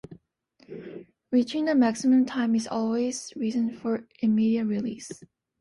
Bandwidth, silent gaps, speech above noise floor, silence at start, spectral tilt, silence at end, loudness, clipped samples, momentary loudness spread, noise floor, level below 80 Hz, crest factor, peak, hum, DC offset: 11.5 kHz; none; 38 dB; 0.1 s; -5.5 dB/octave; 0.35 s; -26 LUFS; under 0.1%; 20 LU; -63 dBFS; -68 dBFS; 16 dB; -12 dBFS; none; under 0.1%